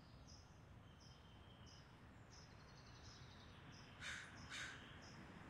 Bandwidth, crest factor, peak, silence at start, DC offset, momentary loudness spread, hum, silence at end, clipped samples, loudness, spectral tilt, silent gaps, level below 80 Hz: 13 kHz; 20 dB; -40 dBFS; 0 s; under 0.1%; 12 LU; none; 0 s; under 0.1%; -58 LUFS; -3.5 dB/octave; none; -70 dBFS